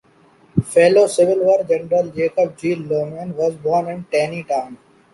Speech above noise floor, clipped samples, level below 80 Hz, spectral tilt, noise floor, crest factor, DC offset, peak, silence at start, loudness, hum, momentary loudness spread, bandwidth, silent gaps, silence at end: 35 dB; under 0.1%; -54 dBFS; -6 dB/octave; -52 dBFS; 16 dB; under 0.1%; -2 dBFS; 0.55 s; -18 LUFS; none; 10 LU; 11.5 kHz; none; 0.4 s